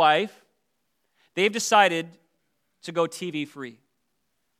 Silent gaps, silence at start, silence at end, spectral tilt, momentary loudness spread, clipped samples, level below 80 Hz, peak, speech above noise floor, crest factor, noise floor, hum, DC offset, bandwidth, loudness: none; 0 s; 0.9 s; -3 dB/octave; 21 LU; under 0.1%; -88 dBFS; -4 dBFS; 53 dB; 24 dB; -77 dBFS; none; under 0.1%; 15.5 kHz; -24 LUFS